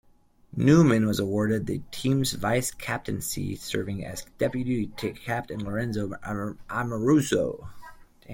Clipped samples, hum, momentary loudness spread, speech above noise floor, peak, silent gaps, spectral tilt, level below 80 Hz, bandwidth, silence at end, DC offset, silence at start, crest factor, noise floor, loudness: under 0.1%; none; 12 LU; 33 dB; -6 dBFS; none; -5.5 dB/octave; -52 dBFS; 17 kHz; 0 s; under 0.1%; 0.55 s; 20 dB; -59 dBFS; -27 LUFS